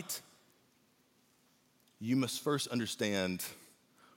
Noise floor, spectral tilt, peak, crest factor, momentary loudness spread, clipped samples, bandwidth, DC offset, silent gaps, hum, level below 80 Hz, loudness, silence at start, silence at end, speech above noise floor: -71 dBFS; -4 dB/octave; -20 dBFS; 20 dB; 10 LU; under 0.1%; 17 kHz; under 0.1%; none; none; -84 dBFS; -36 LUFS; 0 s; 0.5 s; 36 dB